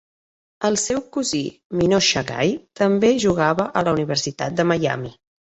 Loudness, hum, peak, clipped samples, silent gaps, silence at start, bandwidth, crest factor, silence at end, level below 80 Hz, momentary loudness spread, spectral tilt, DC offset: -20 LUFS; none; -4 dBFS; under 0.1%; 1.65-1.70 s; 0.6 s; 8.2 kHz; 16 dB; 0.5 s; -52 dBFS; 8 LU; -4 dB/octave; under 0.1%